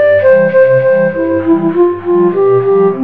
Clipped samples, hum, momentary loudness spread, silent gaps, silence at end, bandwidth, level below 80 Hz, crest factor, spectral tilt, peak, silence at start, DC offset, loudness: under 0.1%; none; 4 LU; none; 0 s; 4.3 kHz; -56 dBFS; 8 dB; -10.5 dB/octave; 0 dBFS; 0 s; 1%; -10 LUFS